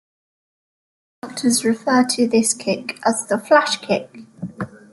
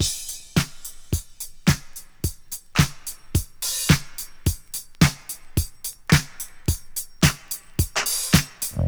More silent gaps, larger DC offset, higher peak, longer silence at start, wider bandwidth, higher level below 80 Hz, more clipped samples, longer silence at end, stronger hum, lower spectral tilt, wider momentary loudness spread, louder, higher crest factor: neither; second, under 0.1% vs 0.1%; about the same, -2 dBFS vs 0 dBFS; first, 1.25 s vs 0 s; second, 12 kHz vs over 20 kHz; second, -64 dBFS vs -36 dBFS; neither; first, 0.15 s vs 0 s; neither; about the same, -3 dB/octave vs -4 dB/octave; first, 17 LU vs 13 LU; first, -18 LUFS vs -24 LUFS; second, 18 dB vs 24 dB